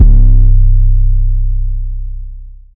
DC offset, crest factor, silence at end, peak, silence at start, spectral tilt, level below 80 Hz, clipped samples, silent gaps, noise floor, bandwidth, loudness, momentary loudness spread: under 0.1%; 8 dB; 0.25 s; 0 dBFS; 0 s; -13.5 dB/octave; -8 dBFS; 5%; none; -28 dBFS; 0.7 kHz; -14 LUFS; 17 LU